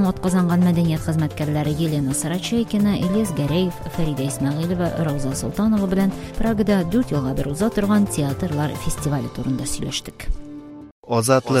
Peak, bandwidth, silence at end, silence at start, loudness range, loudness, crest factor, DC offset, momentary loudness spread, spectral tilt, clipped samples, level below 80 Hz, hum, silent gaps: -2 dBFS; 16 kHz; 0 s; 0 s; 3 LU; -21 LUFS; 18 dB; under 0.1%; 8 LU; -6 dB/octave; under 0.1%; -36 dBFS; none; 10.91-11.03 s